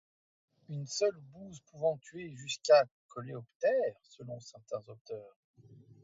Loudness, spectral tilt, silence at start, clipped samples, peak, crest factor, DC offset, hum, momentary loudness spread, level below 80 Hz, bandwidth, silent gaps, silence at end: -33 LUFS; -4 dB/octave; 0.7 s; under 0.1%; -12 dBFS; 22 dB; under 0.1%; none; 22 LU; -80 dBFS; 7.8 kHz; 2.91-3.09 s, 3.55-3.60 s, 5.01-5.05 s, 5.36-5.54 s; 0.3 s